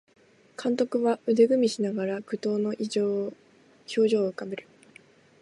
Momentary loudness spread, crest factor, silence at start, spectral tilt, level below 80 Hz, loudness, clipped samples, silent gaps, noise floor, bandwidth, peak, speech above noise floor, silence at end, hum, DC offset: 15 LU; 18 dB; 0.6 s; -5.5 dB/octave; -78 dBFS; -26 LUFS; under 0.1%; none; -56 dBFS; 11.5 kHz; -8 dBFS; 30 dB; 0.8 s; none; under 0.1%